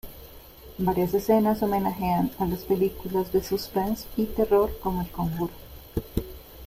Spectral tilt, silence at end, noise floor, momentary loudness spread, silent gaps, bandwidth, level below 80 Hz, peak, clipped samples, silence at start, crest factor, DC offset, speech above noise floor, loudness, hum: -7 dB/octave; 0 s; -46 dBFS; 19 LU; none; 16 kHz; -42 dBFS; -10 dBFS; under 0.1%; 0.05 s; 18 dB; under 0.1%; 21 dB; -26 LUFS; none